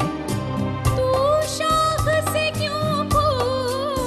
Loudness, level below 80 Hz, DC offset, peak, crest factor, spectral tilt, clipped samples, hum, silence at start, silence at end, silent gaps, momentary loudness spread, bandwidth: -21 LUFS; -36 dBFS; under 0.1%; -8 dBFS; 14 dB; -5 dB/octave; under 0.1%; none; 0 s; 0 s; none; 6 LU; 13 kHz